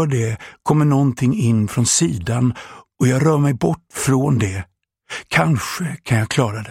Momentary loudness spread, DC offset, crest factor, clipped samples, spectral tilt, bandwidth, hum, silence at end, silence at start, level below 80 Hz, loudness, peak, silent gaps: 10 LU; under 0.1%; 18 dB; under 0.1%; -5.5 dB/octave; 16 kHz; none; 0 s; 0 s; -48 dBFS; -18 LUFS; 0 dBFS; none